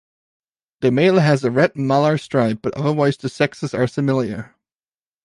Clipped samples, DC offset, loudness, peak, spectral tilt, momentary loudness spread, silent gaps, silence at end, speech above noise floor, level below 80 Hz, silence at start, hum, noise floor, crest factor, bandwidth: under 0.1%; under 0.1%; -18 LUFS; -2 dBFS; -7 dB/octave; 7 LU; none; 0.8 s; over 72 dB; -58 dBFS; 0.8 s; none; under -90 dBFS; 18 dB; 11.5 kHz